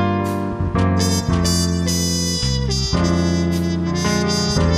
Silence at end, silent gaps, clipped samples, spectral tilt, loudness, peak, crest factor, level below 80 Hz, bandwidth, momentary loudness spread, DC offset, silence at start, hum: 0 s; none; under 0.1%; -5 dB/octave; -19 LUFS; -6 dBFS; 12 dB; -30 dBFS; 15.5 kHz; 3 LU; under 0.1%; 0 s; none